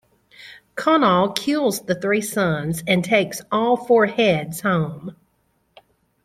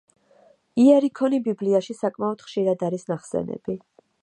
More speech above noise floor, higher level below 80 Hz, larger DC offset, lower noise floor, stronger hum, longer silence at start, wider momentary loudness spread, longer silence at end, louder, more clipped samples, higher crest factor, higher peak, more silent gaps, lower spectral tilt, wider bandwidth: first, 47 dB vs 36 dB; first, -58 dBFS vs -66 dBFS; neither; first, -66 dBFS vs -57 dBFS; neither; second, 0.4 s vs 0.75 s; second, 8 LU vs 14 LU; first, 1.1 s vs 0.45 s; first, -20 LUFS vs -23 LUFS; neither; about the same, 20 dB vs 18 dB; first, 0 dBFS vs -6 dBFS; neither; second, -5 dB/octave vs -7 dB/octave; first, 16 kHz vs 10 kHz